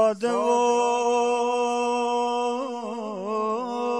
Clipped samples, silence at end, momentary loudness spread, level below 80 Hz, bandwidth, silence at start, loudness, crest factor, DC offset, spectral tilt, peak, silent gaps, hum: under 0.1%; 0 s; 9 LU; -78 dBFS; 10.5 kHz; 0 s; -24 LUFS; 14 dB; under 0.1%; -3.5 dB/octave; -10 dBFS; none; none